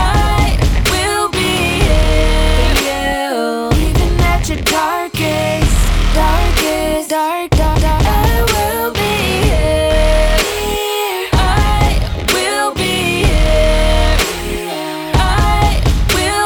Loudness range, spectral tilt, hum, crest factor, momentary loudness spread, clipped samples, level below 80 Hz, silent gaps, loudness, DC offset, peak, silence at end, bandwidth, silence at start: 1 LU; -4.5 dB/octave; none; 12 dB; 4 LU; under 0.1%; -16 dBFS; none; -14 LUFS; 0.2%; -2 dBFS; 0 s; 19 kHz; 0 s